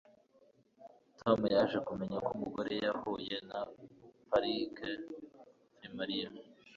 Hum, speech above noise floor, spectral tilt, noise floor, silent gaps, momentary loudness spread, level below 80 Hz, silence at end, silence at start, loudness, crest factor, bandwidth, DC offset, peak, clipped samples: none; 32 dB; -3.5 dB/octave; -68 dBFS; none; 19 LU; -70 dBFS; 0 s; 0.8 s; -36 LUFS; 24 dB; 7.4 kHz; under 0.1%; -14 dBFS; under 0.1%